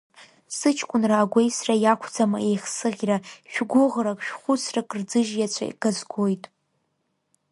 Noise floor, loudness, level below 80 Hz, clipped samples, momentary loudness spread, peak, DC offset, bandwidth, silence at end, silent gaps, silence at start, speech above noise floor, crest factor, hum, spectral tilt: -74 dBFS; -24 LUFS; -72 dBFS; under 0.1%; 7 LU; -4 dBFS; under 0.1%; 11.5 kHz; 1.15 s; none; 0.2 s; 51 dB; 20 dB; none; -4.5 dB/octave